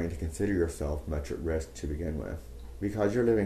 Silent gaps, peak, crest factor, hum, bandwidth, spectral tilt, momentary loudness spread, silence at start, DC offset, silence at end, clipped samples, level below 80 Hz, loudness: none; -14 dBFS; 16 dB; none; 13.5 kHz; -7 dB/octave; 10 LU; 0 s; under 0.1%; 0 s; under 0.1%; -40 dBFS; -32 LUFS